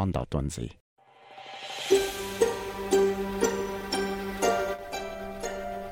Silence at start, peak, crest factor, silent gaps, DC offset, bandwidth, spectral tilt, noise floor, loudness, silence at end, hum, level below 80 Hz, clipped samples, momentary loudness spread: 0 s; -8 dBFS; 20 dB; 0.80-0.96 s; under 0.1%; 17 kHz; -4.5 dB/octave; -49 dBFS; -29 LUFS; 0 s; none; -48 dBFS; under 0.1%; 13 LU